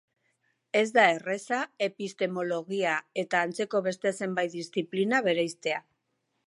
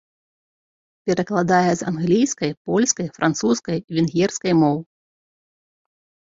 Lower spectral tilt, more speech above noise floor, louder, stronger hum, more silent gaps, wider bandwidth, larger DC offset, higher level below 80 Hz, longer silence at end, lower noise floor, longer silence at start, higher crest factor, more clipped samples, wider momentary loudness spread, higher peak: about the same, -4.5 dB/octave vs -5 dB/octave; second, 50 dB vs over 71 dB; second, -28 LUFS vs -20 LUFS; neither; second, none vs 2.57-2.65 s, 3.84-3.88 s; first, 11.5 kHz vs 7.8 kHz; neither; second, -82 dBFS vs -60 dBFS; second, 0.65 s vs 1.55 s; second, -78 dBFS vs under -90 dBFS; second, 0.75 s vs 1.05 s; about the same, 20 dB vs 18 dB; neither; first, 9 LU vs 6 LU; second, -8 dBFS vs -4 dBFS